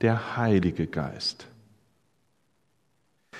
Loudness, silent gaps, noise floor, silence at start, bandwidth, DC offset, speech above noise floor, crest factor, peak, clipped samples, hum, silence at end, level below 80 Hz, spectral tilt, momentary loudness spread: -27 LUFS; none; -72 dBFS; 0 s; 10.5 kHz; under 0.1%; 46 dB; 20 dB; -10 dBFS; under 0.1%; none; 0 s; -54 dBFS; -6.5 dB/octave; 7 LU